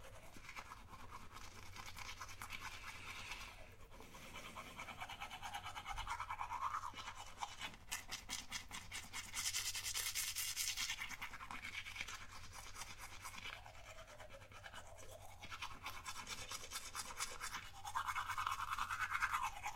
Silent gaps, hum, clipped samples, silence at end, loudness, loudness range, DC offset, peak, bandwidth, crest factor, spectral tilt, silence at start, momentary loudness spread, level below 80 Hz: none; none; under 0.1%; 0 s; -46 LUFS; 10 LU; under 0.1%; -22 dBFS; 16.5 kHz; 26 dB; -0.5 dB/octave; 0 s; 16 LU; -62 dBFS